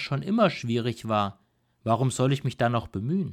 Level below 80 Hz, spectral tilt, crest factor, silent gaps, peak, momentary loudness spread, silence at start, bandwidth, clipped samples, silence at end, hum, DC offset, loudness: -58 dBFS; -6.5 dB/octave; 18 dB; none; -10 dBFS; 6 LU; 0 s; 14 kHz; under 0.1%; 0 s; none; under 0.1%; -26 LUFS